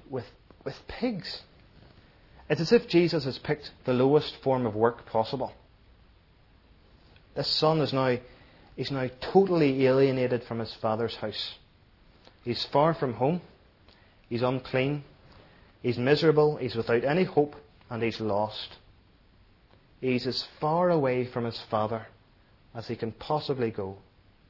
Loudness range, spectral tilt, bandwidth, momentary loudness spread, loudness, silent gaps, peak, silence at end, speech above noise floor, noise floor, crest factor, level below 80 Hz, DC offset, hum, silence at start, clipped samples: 5 LU; -7 dB/octave; 6 kHz; 15 LU; -28 LUFS; none; -8 dBFS; 0.5 s; 33 dB; -60 dBFS; 22 dB; -60 dBFS; under 0.1%; none; 0.1 s; under 0.1%